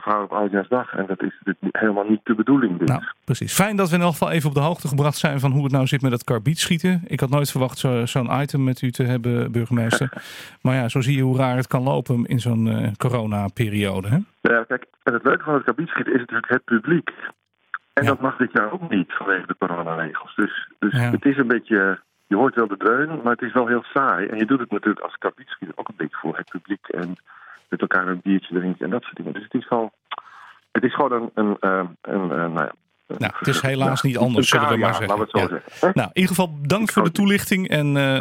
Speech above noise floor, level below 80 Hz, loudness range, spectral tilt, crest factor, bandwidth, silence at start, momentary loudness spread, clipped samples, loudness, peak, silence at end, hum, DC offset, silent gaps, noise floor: 25 dB; -60 dBFS; 5 LU; -6 dB/octave; 20 dB; 16.5 kHz; 0 s; 9 LU; under 0.1%; -21 LUFS; 0 dBFS; 0 s; none; under 0.1%; none; -46 dBFS